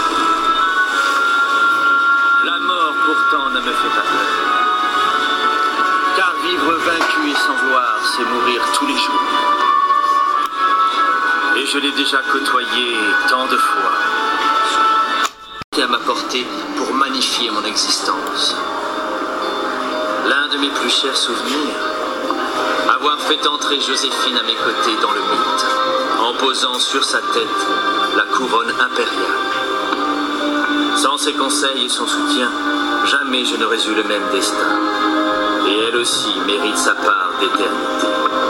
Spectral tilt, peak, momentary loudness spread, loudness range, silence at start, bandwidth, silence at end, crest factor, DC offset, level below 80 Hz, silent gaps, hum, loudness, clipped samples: -1 dB/octave; 0 dBFS; 5 LU; 3 LU; 0 s; 16.5 kHz; 0 s; 16 dB; under 0.1%; -54 dBFS; 15.64-15.72 s; none; -15 LUFS; under 0.1%